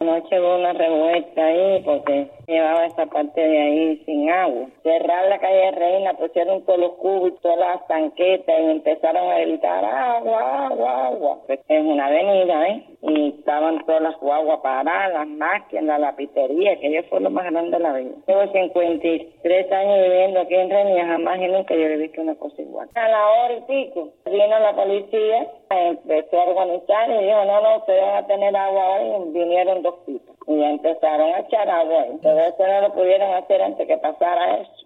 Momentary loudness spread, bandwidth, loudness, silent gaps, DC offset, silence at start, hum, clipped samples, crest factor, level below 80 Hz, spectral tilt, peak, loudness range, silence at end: 6 LU; 4.1 kHz; -19 LUFS; none; under 0.1%; 0 s; none; under 0.1%; 12 dB; -72 dBFS; -7 dB/octave; -6 dBFS; 2 LU; 0.2 s